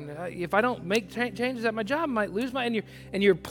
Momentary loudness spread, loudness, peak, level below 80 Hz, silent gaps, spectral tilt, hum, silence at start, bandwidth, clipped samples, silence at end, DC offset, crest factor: 8 LU; -28 LUFS; -8 dBFS; -58 dBFS; none; -5.5 dB/octave; none; 0 s; 17.5 kHz; under 0.1%; 0 s; under 0.1%; 20 dB